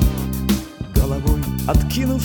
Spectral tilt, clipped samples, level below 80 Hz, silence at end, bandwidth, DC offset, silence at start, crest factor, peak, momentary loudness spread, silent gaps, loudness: -6 dB/octave; under 0.1%; -22 dBFS; 0 s; 18 kHz; under 0.1%; 0 s; 16 dB; -2 dBFS; 4 LU; none; -21 LUFS